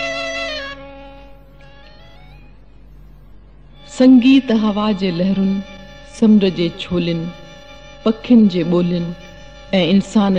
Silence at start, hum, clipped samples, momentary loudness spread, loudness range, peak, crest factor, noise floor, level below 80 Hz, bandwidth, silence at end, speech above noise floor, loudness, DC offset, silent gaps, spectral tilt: 0 s; none; under 0.1%; 23 LU; 5 LU; -2 dBFS; 16 dB; -43 dBFS; -44 dBFS; 9 kHz; 0 s; 29 dB; -16 LUFS; 0.6%; none; -7 dB/octave